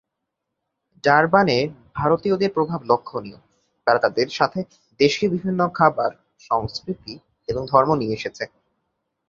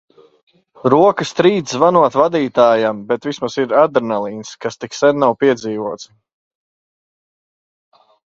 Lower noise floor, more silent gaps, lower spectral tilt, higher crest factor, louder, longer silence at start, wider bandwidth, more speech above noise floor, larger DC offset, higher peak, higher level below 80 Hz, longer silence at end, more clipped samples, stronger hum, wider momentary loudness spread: second, -80 dBFS vs under -90 dBFS; neither; about the same, -6 dB/octave vs -5.5 dB/octave; first, 22 dB vs 16 dB; second, -21 LUFS vs -15 LUFS; first, 1.05 s vs 0.85 s; about the same, 7.6 kHz vs 7.8 kHz; second, 60 dB vs over 75 dB; neither; about the same, 0 dBFS vs 0 dBFS; first, -54 dBFS vs -60 dBFS; second, 0.8 s vs 2.2 s; neither; neither; about the same, 15 LU vs 13 LU